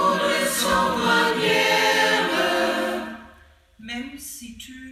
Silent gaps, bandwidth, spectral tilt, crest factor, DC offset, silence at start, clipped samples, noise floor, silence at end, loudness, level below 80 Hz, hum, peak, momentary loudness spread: none; 16 kHz; -2.5 dB/octave; 16 dB; under 0.1%; 0 s; under 0.1%; -52 dBFS; 0 s; -20 LUFS; -52 dBFS; none; -6 dBFS; 18 LU